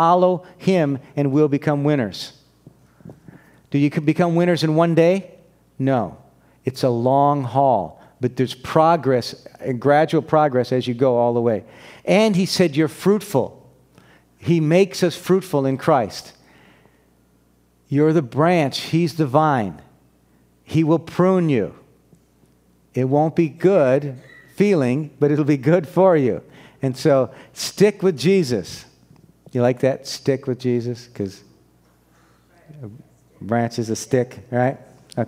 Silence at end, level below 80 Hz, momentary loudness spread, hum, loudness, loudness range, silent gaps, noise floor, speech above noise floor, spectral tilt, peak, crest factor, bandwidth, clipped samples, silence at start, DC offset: 0 s; -60 dBFS; 14 LU; none; -19 LUFS; 6 LU; none; -58 dBFS; 40 dB; -6.5 dB/octave; 0 dBFS; 20 dB; 16 kHz; under 0.1%; 0 s; under 0.1%